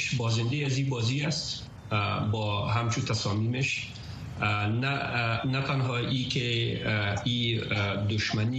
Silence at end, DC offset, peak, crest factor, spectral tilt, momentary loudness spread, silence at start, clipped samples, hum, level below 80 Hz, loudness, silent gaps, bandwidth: 0 s; under 0.1%; -14 dBFS; 16 dB; -5 dB/octave; 3 LU; 0 s; under 0.1%; none; -54 dBFS; -28 LUFS; none; 8.6 kHz